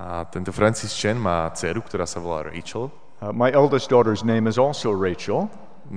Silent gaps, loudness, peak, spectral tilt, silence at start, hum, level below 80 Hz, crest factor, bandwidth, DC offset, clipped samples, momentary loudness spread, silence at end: none; -22 LUFS; -4 dBFS; -5.5 dB/octave; 0 s; none; -50 dBFS; 20 dB; 10 kHz; 1%; under 0.1%; 13 LU; 0 s